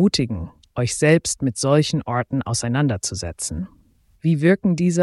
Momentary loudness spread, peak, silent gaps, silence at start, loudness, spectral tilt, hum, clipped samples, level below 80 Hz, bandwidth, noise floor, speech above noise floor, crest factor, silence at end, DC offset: 10 LU; -4 dBFS; none; 0 s; -21 LUFS; -5 dB/octave; none; under 0.1%; -46 dBFS; 12 kHz; -45 dBFS; 25 dB; 16 dB; 0 s; under 0.1%